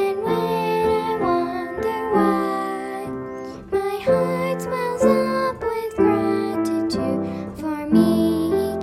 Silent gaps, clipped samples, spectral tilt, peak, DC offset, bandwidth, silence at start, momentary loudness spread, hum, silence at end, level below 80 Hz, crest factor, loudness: none; under 0.1%; -6.5 dB/octave; -4 dBFS; under 0.1%; 15 kHz; 0 s; 10 LU; none; 0 s; -50 dBFS; 16 dB; -21 LUFS